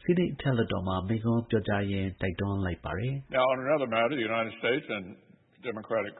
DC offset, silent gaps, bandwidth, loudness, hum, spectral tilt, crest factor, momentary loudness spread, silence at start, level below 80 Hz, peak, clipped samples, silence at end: under 0.1%; none; 4.1 kHz; -30 LUFS; none; -11 dB/octave; 16 dB; 8 LU; 0.05 s; -54 dBFS; -14 dBFS; under 0.1%; 0 s